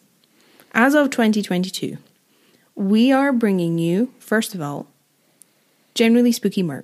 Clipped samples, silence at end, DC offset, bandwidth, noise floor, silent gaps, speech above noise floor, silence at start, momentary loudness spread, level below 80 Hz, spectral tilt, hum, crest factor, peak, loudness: under 0.1%; 0 s; under 0.1%; 15 kHz; -61 dBFS; none; 43 dB; 0.75 s; 14 LU; -76 dBFS; -5.5 dB/octave; none; 18 dB; -2 dBFS; -19 LUFS